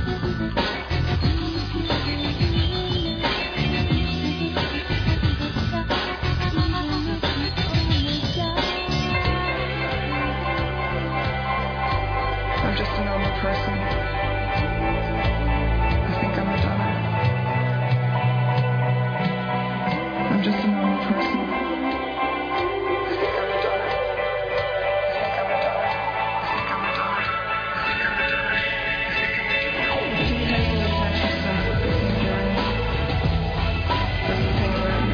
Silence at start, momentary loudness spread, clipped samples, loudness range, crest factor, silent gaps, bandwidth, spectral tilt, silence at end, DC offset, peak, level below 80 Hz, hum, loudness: 0 s; 3 LU; under 0.1%; 2 LU; 14 dB; none; 5.4 kHz; -7 dB/octave; 0 s; under 0.1%; -8 dBFS; -32 dBFS; none; -23 LUFS